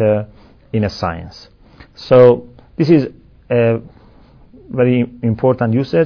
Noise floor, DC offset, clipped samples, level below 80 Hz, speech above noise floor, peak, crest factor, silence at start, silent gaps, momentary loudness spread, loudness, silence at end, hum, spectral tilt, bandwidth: -44 dBFS; under 0.1%; 0.1%; -44 dBFS; 30 dB; 0 dBFS; 16 dB; 0 s; none; 19 LU; -15 LUFS; 0 s; none; -9 dB/octave; 5.4 kHz